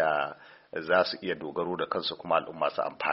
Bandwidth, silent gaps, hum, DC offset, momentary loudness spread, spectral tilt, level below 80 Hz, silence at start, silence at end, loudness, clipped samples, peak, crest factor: 5.8 kHz; none; none; under 0.1%; 11 LU; -1.5 dB/octave; -70 dBFS; 0 s; 0 s; -30 LUFS; under 0.1%; -10 dBFS; 20 dB